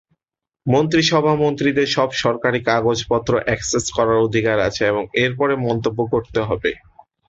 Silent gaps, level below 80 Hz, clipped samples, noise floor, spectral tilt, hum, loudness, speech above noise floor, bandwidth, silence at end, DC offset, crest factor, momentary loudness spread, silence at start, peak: none; -46 dBFS; under 0.1%; -87 dBFS; -5 dB/octave; none; -18 LUFS; 69 dB; 8 kHz; 0.5 s; under 0.1%; 16 dB; 5 LU; 0.65 s; -2 dBFS